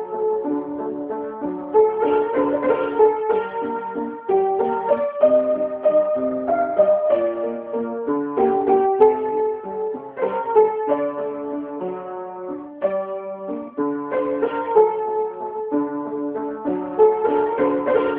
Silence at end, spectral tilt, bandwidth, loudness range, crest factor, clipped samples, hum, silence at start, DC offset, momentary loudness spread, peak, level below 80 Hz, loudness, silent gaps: 0 s; -10.5 dB/octave; 3.7 kHz; 4 LU; 18 dB; under 0.1%; none; 0 s; under 0.1%; 11 LU; -2 dBFS; -62 dBFS; -21 LUFS; none